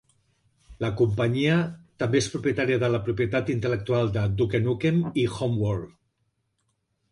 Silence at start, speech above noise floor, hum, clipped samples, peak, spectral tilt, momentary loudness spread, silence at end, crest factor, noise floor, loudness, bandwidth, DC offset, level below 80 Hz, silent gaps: 0.7 s; 50 dB; none; under 0.1%; -10 dBFS; -6.5 dB/octave; 7 LU; 1.25 s; 16 dB; -74 dBFS; -25 LUFS; 11.5 kHz; under 0.1%; -50 dBFS; none